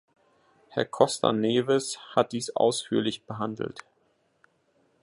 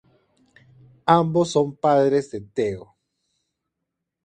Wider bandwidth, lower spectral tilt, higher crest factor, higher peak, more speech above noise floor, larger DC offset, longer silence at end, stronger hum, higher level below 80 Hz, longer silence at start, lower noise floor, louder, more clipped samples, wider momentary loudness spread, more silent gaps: first, 11.5 kHz vs 9.4 kHz; second, -4.5 dB/octave vs -6.5 dB/octave; about the same, 24 dB vs 24 dB; second, -4 dBFS vs 0 dBFS; second, 43 dB vs 61 dB; neither; second, 1.25 s vs 1.45 s; neither; second, -70 dBFS vs -60 dBFS; second, 0.7 s vs 1.05 s; second, -69 dBFS vs -82 dBFS; second, -27 LUFS vs -21 LUFS; neither; about the same, 10 LU vs 11 LU; neither